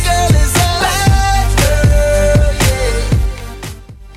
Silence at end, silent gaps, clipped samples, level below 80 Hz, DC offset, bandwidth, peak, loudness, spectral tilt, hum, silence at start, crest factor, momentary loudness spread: 0 s; none; under 0.1%; -16 dBFS; under 0.1%; 16 kHz; 0 dBFS; -12 LUFS; -4.5 dB/octave; none; 0 s; 12 dB; 12 LU